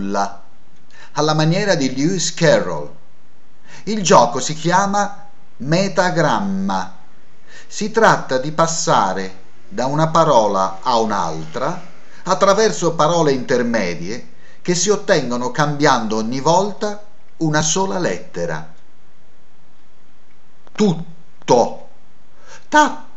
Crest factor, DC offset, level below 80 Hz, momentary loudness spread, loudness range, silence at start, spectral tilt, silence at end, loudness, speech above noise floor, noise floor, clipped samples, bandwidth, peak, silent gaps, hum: 18 dB; 6%; -58 dBFS; 15 LU; 5 LU; 0 s; -4.5 dB/octave; 0.15 s; -17 LUFS; 38 dB; -55 dBFS; under 0.1%; 8.4 kHz; 0 dBFS; none; none